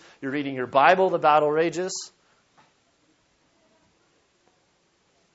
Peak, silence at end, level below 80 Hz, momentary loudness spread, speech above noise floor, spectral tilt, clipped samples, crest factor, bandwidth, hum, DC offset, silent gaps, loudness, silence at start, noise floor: -2 dBFS; 3.25 s; -74 dBFS; 13 LU; 45 dB; -4 dB/octave; under 0.1%; 24 dB; 8 kHz; none; under 0.1%; none; -22 LUFS; 0.2 s; -66 dBFS